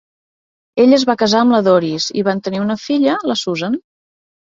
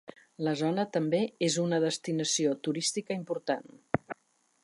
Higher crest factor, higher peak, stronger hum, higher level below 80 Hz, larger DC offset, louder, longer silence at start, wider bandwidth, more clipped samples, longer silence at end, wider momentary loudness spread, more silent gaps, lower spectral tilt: second, 14 dB vs 22 dB; first, -2 dBFS vs -8 dBFS; neither; first, -58 dBFS vs -70 dBFS; neither; first, -15 LUFS vs -31 LUFS; first, 0.75 s vs 0.4 s; second, 7.8 kHz vs 11.5 kHz; neither; first, 0.8 s vs 0.5 s; about the same, 9 LU vs 7 LU; neither; about the same, -5 dB/octave vs -4 dB/octave